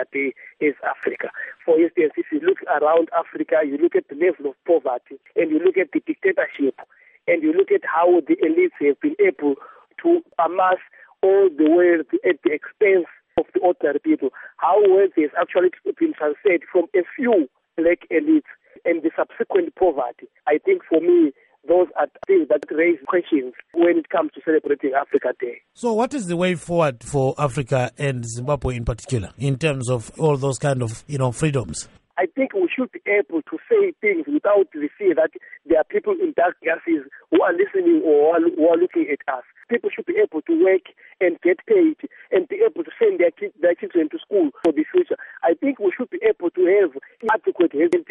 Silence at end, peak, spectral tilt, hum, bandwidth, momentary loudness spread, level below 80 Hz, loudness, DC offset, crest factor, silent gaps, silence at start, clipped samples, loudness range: 0.1 s; -6 dBFS; -6.5 dB/octave; none; 11 kHz; 8 LU; -50 dBFS; -20 LUFS; under 0.1%; 14 dB; none; 0 s; under 0.1%; 4 LU